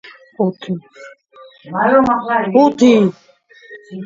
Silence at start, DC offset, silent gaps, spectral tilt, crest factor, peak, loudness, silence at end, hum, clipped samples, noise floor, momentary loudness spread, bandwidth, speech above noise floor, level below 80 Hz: 0.05 s; under 0.1%; none; -6.5 dB/octave; 16 dB; 0 dBFS; -14 LUFS; 0 s; none; under 0.1%; -43 dBFS; 15 LU; 7.6 kHz; 29 dB; -56 dBFS